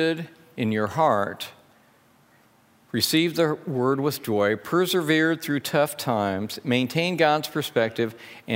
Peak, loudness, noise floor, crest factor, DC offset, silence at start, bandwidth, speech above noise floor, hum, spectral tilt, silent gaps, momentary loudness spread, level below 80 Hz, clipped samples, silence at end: -4 dBFS; -24 LUFS; -59 dBFS; 20 dB; under 0.1%; 0 s; 16.5 kHz; 35 dB; none; -5 dB/octave; none; 9 LU; -68 dBFS; under 0.1%; 0 s